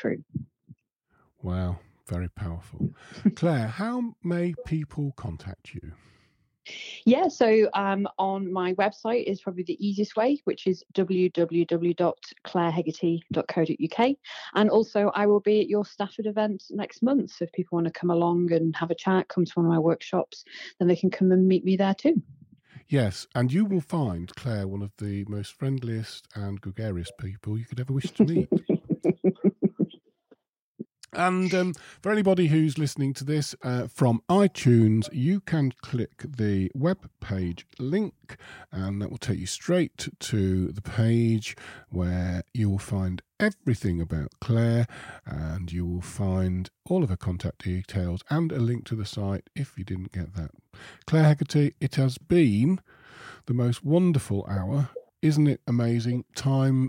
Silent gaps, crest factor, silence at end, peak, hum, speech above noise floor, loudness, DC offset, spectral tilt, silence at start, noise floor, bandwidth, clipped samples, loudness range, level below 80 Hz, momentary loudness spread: 30.49-30.53 s, 30.59-30.75 s; 18 dB; 0 s; -8 dBFS; none; 43 dB; -26 LUFS; under 0.1%; -7.5 dB/octave; 0 s; -69 dBFS; 15.5 kHz; under 0.1%; 6 LU; -52 dBFS; 13 LU